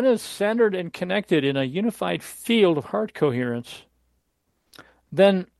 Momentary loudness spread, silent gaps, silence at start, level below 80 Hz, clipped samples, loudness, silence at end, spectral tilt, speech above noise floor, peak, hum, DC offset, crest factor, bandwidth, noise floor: 10 LU; none; 0 s; -66 dBFS; under 0.1%; -23 LUFS; 0.15 s; -6 dB/octave; 50 dB; -4 dBFS; none; under 0.1%; 20 dB; 12.5 kHz; -72 dBFS